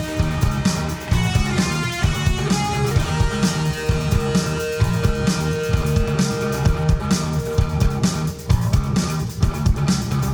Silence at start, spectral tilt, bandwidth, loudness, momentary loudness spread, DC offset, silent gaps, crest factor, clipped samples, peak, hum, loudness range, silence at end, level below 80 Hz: 0 s; -5.5 dB/octave; over 20 kHz; -20 LUFS; 2 LU; under 0.1%; none; 14 dB; under 0.1%; -4 dBFS; none; 0 LU; 0 s; -26 dBFS